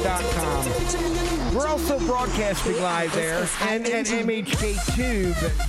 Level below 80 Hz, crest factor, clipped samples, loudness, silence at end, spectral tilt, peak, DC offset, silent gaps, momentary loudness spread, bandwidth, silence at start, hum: -30 dBFS; 14 dB; under 0.1%; -24 LUFS; 0 s; -4 dB/octave; -10 dBFS; under 0.1%; none; 1 LU; 16 kHz; 0 s; none